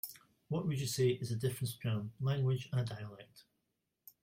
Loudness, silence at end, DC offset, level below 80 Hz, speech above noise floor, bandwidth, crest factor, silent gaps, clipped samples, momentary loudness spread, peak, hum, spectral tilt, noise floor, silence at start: -37 LUFS; 0.8 s; under 0.1%; -70 dBFS; 49 dB; 16.5 kHz; 16 dB; none; under 0.1%; 13 LU; -22 dBFS; none; -6 dB/octave; -85 dBFS; 0.05 s